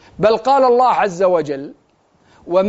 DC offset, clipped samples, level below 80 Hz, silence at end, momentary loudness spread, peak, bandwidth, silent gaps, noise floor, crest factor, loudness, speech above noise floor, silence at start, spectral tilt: under 0.1%; under 0.1%; -54 dBFS; 0 s; 14 LU; 0 dBFS; 8 kHz; none; -56 dBFS; 16 dB; -15 LUFS; 42 dB; 0.2 s; -4 dB/octave